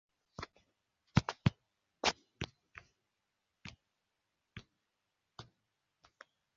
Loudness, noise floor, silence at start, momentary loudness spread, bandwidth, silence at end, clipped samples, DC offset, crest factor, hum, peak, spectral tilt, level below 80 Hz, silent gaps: -38 LUFS; -86 dBFS; 0.4 s; 22 LU; 7.4 kHz; 1.15 s; under 0.1%; under 0.1%; 32 dB; none; -12 dBFS; -4.5 dB/octave; -58 dBFS; none